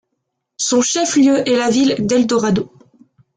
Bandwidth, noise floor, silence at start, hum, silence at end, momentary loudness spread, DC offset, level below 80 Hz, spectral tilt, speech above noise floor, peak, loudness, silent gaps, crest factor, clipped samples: 9.6 kHz; -74 dBFS; 0.6 s; none; 0.7 s; 7 LU; under 0.1%; -56 dBFS; -4 dB/octave; 60 dB; -4 dBFS; -15 LUFS; none; 12 dB; under 0.1%